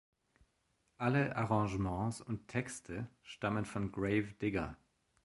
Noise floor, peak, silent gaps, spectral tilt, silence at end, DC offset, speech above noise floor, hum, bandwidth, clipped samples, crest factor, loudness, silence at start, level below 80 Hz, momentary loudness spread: -78 dBFS; -18 dBFS; none; -6.5 dB/octave; 0.5 s; under 0.1%; 42 dB; none; 11.5 kHz; under 0.1%; 20 dB; -37 LUFS; 1 s; -58 dBFS; 10 LU